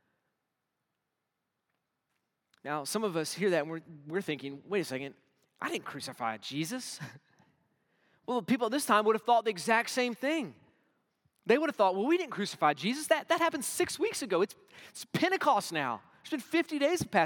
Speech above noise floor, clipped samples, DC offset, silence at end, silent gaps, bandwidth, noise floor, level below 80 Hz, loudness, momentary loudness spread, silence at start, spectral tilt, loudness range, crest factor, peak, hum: 54 dB; under 0.1%; under 0.1%; 0 s; none; 18 kHz; -85 dBFS; -78 dBFS; -31 LUFS; 14 LU; 2.65 s; -4 dB/octave; 8 LU; 22 dB; -10 dBFS; none